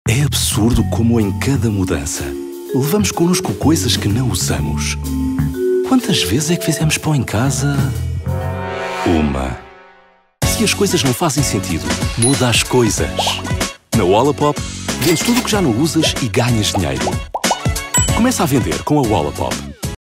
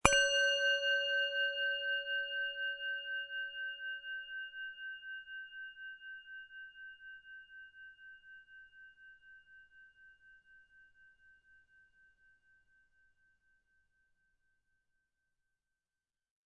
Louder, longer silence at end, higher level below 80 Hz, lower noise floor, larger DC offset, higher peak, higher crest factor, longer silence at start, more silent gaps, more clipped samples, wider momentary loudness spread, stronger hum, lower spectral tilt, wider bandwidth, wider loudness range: first, -16 LUFS vs -35 LUFS; second, 0.1 s vs 6 s; first, -32 dBFS vs -64 dBFS; second, -49 dBFS vs under -90 dBFS; neither; about the same, -4 dBFS vs -4 dBFS; second, 12 dB vs 36 dB; about the same, 0.05 s vs 0.05 s; neither; neither; second, 8 LU vs 25 LU; neither; first, -4.5 dB/octave vs -1 dB/octave; first, 16 kHz vs 9 kHz; second, 3 LU vs 25 LU